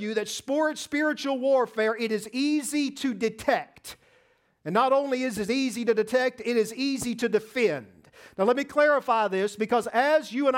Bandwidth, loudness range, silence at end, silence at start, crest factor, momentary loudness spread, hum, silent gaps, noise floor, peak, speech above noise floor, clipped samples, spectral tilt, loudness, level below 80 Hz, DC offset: 16.5 kHz; 2 LU; 0 s; 0 s; 16 dB; 6 LU; none; none; -65 dBFS; -10 dBFS; 39 dB; under 0.1%; -4 dB/octave; -26 LUFS; -66 dBFS; under 0.1%